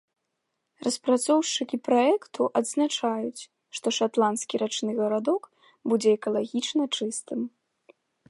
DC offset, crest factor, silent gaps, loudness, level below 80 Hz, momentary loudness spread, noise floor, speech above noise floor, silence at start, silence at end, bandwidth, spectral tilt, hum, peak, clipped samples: under 0.1%; 18 dB; none; -26 LUFS; -82 dBFS; 10 LU; -80 dBFS; 54 dB; 0.8 s; 0.8 s; 11.5 kHz; -3.5 dB/octave; none; -10 dBFS; under 0.1%